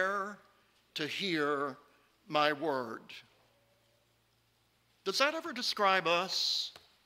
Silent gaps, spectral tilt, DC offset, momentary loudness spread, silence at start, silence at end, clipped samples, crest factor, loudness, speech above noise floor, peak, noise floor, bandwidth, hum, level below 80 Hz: none; -2.5 dB/octave; under 0.1%; 15 LU; 0 s; 0.3 s; under 0.1%; 24 dB; -32 LUFS; 39 dB; -12 dBFS; -72 dBFS; 16 kHz; none; -82 dBFS